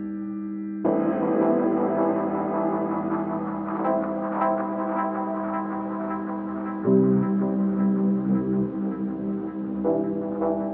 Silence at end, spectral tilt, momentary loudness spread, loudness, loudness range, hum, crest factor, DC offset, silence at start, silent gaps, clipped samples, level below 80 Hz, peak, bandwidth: 0 s; -10 dB/octave; 8 LU; -25 LUFS; 3 LU; none; 16 dB; under 0.1%; 0 s; none; under 0.1%; -58 dBFS; -8 dBFS; 3.2 kHz